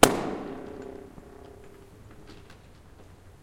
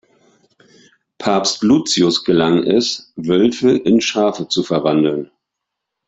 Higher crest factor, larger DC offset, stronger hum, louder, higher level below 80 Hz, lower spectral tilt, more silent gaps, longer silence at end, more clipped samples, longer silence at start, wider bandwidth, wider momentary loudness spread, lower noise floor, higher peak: first, 30 dB vs 16 dB; neither; neither; second, -30 LUFS vs -16 LUFS; first, -50 dBFS vs -56 dBFS; second, -3 dB/octave vs -4.5 dB/octave; neither; second, 0.1 s vs 0.8 s; neither; second, 0 s vs 1.2 s; first, 16.5 kHz vs 8.4 kHz; first, 19 LU vs 7 LU; second, -51 dBFS vs -79 dBFS; about the same, 0 dBFS vs -2 dBFS